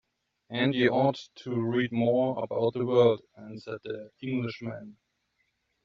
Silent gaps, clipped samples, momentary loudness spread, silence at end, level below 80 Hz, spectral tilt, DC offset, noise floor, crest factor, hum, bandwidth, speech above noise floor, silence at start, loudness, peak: none; under 0.1%; 16 LU; 0.9 s; -70 dBFS; -5 dB/octave; under 0.1%; -76 dBFS; 20 dB; none; 7.2 kHz; 48 dB; 0.5 s; -28 LUFS; -8 dBFS